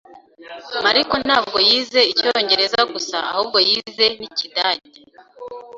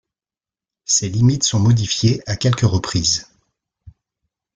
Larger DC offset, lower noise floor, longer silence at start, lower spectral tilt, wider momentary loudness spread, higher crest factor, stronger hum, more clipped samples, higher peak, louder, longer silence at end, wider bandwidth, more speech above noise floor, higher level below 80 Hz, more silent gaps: neither; second, -40 dBFS vs under -90 dBFS; second, 0.1 s vs 0.9 s; second, -2 dB/octave vs -4.5 dB/octave; first, 12 LU vs 4 LU; about the same, 18 dB vs 16 dB; neither; neither; about the same, -2 dBFS vs -2 dBFS; about the same, -17 LUFS vs -17 LUFS; second, 0 s vs 0.65 s; second, 7.8 kHz vs 9.4 kHz; second, 22 dB vs over 73 dB; second, -58 dBFS vs -46 dBFS; neither